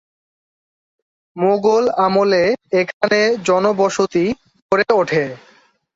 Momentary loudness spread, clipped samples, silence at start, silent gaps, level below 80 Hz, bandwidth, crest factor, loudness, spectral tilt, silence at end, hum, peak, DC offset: 6 LU; under 0.1%; 1.35 s; 2.94-3.01 s, 4.62-4.69 s; -58 dBFS; 8 kHz; 16 dB; -16 LUFS; -5 dB/octave; 0.6 s; none; -2 dBFS; under 0.1%